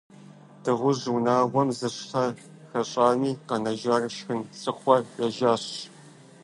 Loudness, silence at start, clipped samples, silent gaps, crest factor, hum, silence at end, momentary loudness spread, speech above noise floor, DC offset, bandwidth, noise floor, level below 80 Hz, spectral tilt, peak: -26 LUFS; 0.6 s; under 0.1%; none; 22 dB; none; 0.35 s; 11 LU; 25 dB; under 0.1%; 11.5 kHz; -50 dBFS; -72 dBFS; -5.5 dB/octave; -4 dBFS